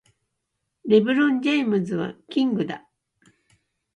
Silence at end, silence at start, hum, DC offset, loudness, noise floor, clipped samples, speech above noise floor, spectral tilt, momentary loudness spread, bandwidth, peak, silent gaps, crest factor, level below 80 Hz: 1.15 s; 0.85 s; none; under 0.1%; -22 LUFS; -79 dBFS; under 0.1%; 57 dB; -7 dB/octave; 12 LU; 9.4 kHz; -6 dBFS; none; 18 dB; -70 dBFS